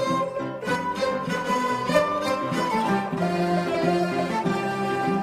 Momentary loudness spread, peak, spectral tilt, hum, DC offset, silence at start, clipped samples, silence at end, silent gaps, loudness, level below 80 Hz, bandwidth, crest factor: 4 LU; -6 dBFS; -5.5 dB/octave; none; under 0.1%; 0 s; under 0.1%; 0 s; none; -25 LUFS; -58 dBFS; 15.5 kHz; 18 dB